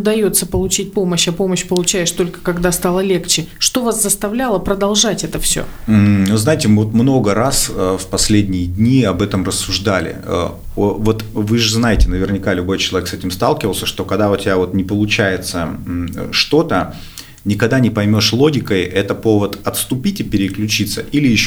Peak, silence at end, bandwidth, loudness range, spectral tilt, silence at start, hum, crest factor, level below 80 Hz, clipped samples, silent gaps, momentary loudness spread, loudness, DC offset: 0 dBFS; 0 s; over 20 kHz; 3 LU; -4.5 dB/octave; 0 s; none; 16 dB; -30 dBFS; under 0.1%; none; 6 LU; -15 LUFS; under 0.1%